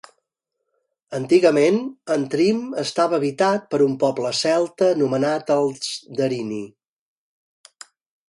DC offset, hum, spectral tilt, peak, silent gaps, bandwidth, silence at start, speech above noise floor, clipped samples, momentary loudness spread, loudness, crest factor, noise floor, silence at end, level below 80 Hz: under 0.1%; none; -5 dB/octave; -2 dBFS; none; 11.5 kHz; 1.1 s; 59 dB; under 0.1%; 11 LU; -20 LUFS; 18 dB; -79 dBFS; 1.6 s; -68 dBFS